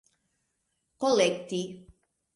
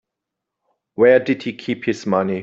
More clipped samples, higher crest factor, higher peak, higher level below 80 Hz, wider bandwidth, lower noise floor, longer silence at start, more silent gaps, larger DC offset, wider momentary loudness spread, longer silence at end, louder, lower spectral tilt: neither; about the same, 20 dB vs 16 dB; second, -10 dBFS vs -2 dBFS; second, -68 dBFS vs -62 dBFS; first, 11.5 kHz vs 7.6 kHz; second, -78 dBFS vs -82 dBFS; about the same, 1 s vs 1 s; neither; neither; about the same, 11 LU vs 11 LU; first, 0.55 s vs 0 s; second, -27 LUFS vs -18 LUFS; second, -4 dB/octave vs -6.5 dB/octave